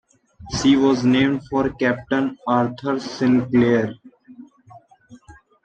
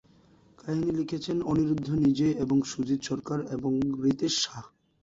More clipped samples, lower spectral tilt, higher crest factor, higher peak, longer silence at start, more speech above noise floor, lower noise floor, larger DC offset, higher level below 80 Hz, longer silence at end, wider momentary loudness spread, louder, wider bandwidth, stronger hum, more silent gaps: neither; about the same, -6 dB/octave vs -5.5 dB/octave; about the same, 16 dB vs 14 dB; first, -4 dBFS vs -14 dBFS; second, 0.4 s vs 0.65 s; about the same, 30 dB vs 32 dB; second, -49 dBFS vs -59 dBFS; neither; first, -50 dBFS vs -56 dBFS; about the same, 0.3 s vs 0.35 s; about the same, 8 LU vs 7 LU; first, -19 LUFS vs -28 LUFS; first, 8.6 kHz vs 7.8 kHz; neither; neither